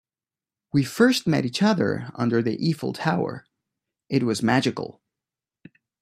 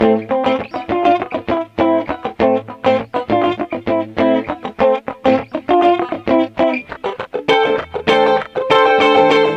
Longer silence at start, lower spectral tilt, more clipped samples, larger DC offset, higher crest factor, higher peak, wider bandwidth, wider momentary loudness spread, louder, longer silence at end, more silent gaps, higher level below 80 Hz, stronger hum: first, 0.75 s vs 0 s; about the same, -6 dB/octave vs -6 dB/octave; neither; neither; first, 20 dB vs 14 dB; second, -4 dBFS vs 0 dBFS; first, 14.5 kHz vs 8.4 kHz; about the same, 8 LU vs 9 LU; second, -23 LUFS vs -16 LUFS; first, 1.1 s vs 0 s; neither; second, -64 dBFS vs -48 dBFS; neither